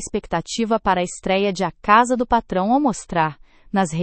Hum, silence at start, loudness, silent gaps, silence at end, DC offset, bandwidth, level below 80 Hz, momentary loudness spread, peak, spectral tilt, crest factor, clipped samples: none; 0 s; -20 LUFS; none; 0 s; under 0.1%; 8.8 kHz; -44 dBFS; 9 LU; 0 dBFS; -5 dB/octave; 20 dB; under 0.1%